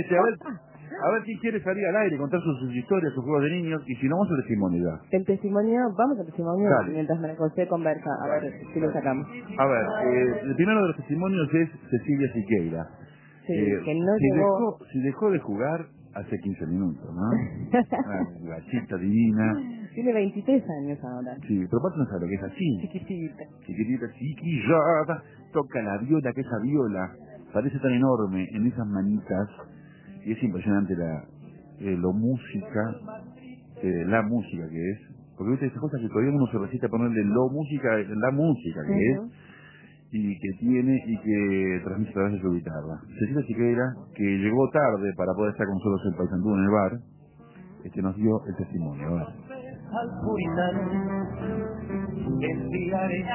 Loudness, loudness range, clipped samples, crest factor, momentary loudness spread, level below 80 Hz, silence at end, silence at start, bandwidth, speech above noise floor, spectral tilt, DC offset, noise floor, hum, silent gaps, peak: -27 LUFS; 4 LU; under 0.1%; 20 dB; 11 LU; -54 dBFS; 0 s; 0 s; 3.2 kHz; 25 dB; -12 dB/octave; under 0.1%; -51 dBFS; none; none; -6 dBFS